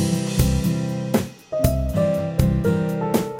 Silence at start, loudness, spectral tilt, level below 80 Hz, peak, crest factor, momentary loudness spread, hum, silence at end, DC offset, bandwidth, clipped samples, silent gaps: 0 s; -22 LUFS; -6.5 dB/octave; -30 dBFS; -4 dBFS; 18 dB; 4 LU; none; 0 s; under 0.1%; 17 kHz; under 0.1%; none